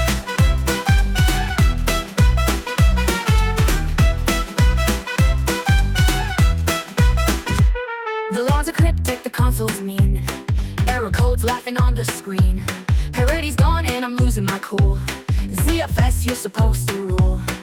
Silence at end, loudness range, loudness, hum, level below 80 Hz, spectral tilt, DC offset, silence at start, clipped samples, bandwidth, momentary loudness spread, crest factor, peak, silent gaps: 0 s; 2 LU; -19 LUFS; none; -20 dBFS; -5 dB/octave; under 0.1%; 0 s; under 0.1%; 18 kHz; 5 LU; 12 dB; -6 dBFS; none